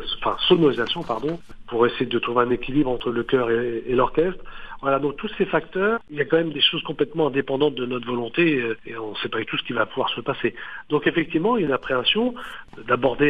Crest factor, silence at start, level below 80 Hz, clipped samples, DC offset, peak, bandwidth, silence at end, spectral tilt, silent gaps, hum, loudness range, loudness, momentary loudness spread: 18 dB; 0 s; -46 dBFS; under 0.1%; 0.7%; -4 dBFS; 6 kHz; 0 s; -7 dB/octave; none; none; 2 LU; -23 LUFS; 9 LU